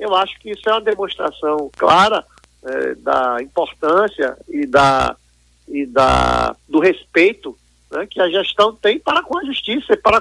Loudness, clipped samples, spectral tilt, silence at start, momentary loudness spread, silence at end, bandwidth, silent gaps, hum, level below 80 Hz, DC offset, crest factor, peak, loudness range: -17 LUFS; under 0.1%; -4.5 dB/octave; 0 s; 11 LU; 0 s; 12 kHz; none; none; -38 dBFS; under 0.1%; 16 dB; 0 dBFS; 2 LU